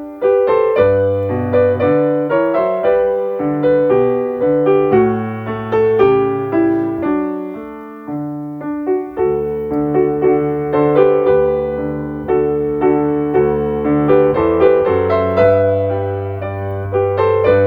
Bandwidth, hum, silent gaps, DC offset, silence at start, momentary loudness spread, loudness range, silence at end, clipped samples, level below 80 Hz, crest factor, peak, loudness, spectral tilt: 4.8 kHz; none; none; under 0.1%; 0 s; 10 LU; 5 LU; 0 s; under 0.1%; -42 dBFS; 14 dB; 0 dBFS; -15 LUFS; -10 dB/octave